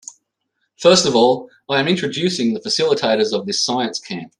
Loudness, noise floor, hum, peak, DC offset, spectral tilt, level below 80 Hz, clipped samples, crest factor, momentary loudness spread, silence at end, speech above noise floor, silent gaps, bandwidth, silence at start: -17 LUFS; -72 dBFS; none; 0 dBFS; under 0.1%; -3.5 dB/octave; -62 dBFS; under 0.1%; 18 dB; 9 LU; 0.1 s; 55 dB; none; 11.5 kHz; 0.8 s